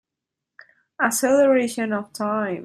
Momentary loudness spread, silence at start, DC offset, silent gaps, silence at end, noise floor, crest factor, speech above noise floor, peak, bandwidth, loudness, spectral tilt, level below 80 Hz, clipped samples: 9 LU; 1 s; under 0.1%; none; 0 s; -85 dBFS; 18 dB; 64 dB; -4 dBFS; 15 kHz; -21 LUFS; -4 dB/octave; -70 dBFS; under 0.1%